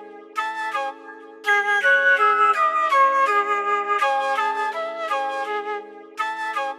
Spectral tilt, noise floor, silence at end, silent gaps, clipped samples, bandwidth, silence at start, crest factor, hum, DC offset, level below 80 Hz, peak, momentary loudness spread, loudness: 0 dB/octave; -41 dBFS; 0 s; none; under 0.1%; 14 kHz; 0 s; 14 dB; none; under 0.1%; under -90 dBFS; -8 dBFS; 14 LU; -20 LUFS